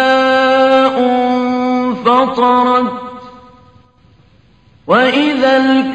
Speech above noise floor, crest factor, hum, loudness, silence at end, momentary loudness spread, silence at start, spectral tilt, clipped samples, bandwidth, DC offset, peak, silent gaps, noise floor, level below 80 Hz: 37 dB; 12 dB; none; -12 LUFS; 0 s; 5 LU; 0 s; -5 dB/octave; under 0.1%; 8.4 kHz; 0.1%; 0 dBFS; none; -48 dBFS; -54 dBFS